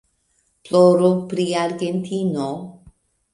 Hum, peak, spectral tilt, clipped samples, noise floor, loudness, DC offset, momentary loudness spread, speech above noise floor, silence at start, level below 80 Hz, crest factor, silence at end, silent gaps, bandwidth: none; -2 dBFS; -6.5 dB/octave; under 0.1%; -66 dBFS; -19 LUFS; under 0.1%; 14 LU; 48 dB; 0.65 s; -60 dBFS; 18 dB; 0.6 s; none; 11.5 kHz